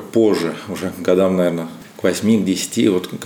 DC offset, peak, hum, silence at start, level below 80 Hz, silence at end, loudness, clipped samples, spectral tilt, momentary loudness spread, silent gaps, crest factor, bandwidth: under 0.1%; -2 dBFS; none; 0 s; -62 dBFS; 0 s; -18 LUFS; under 0.1%; -5.5 dB/octave; 10 LU; none; 14 dB; 19.5 kHz